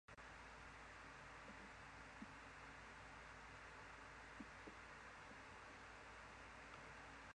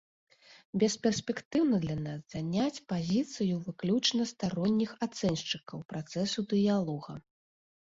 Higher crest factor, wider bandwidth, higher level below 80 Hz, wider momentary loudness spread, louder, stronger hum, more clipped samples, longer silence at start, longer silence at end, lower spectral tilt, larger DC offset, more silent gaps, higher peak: about the same, 16 dB vs 18 dB; first, 10 kHz vs 7.8 kHz; second, -70 dBFS vs -64 dBFS; second, 1 LU vs 10 LU; second, -58 LUFS vs -32 LUFS; neither; neither; second, 0.1 s vs 0.5 s; second, 0 s vs 0.7 s; second, -4 dB/octave vs -5.5 dB/octave; neither; second, none vs 0.65-0.73 s, 1.45-1.51 s, 5.85-5.89 s; second, -44 dBFS vs -14 dBFS